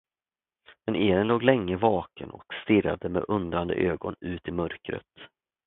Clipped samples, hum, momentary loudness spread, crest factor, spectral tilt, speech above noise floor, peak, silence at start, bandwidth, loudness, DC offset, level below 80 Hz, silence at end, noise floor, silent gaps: under 0.1%; none; 15 LU; 22 dB; -11 dB/octave; over 63 dB; -4 dBFS; 0.7 s; 4.1 kHz; -27 LUFS; under 0.1%; -50 dBFS; 0.4 s; under -90 dBFS; none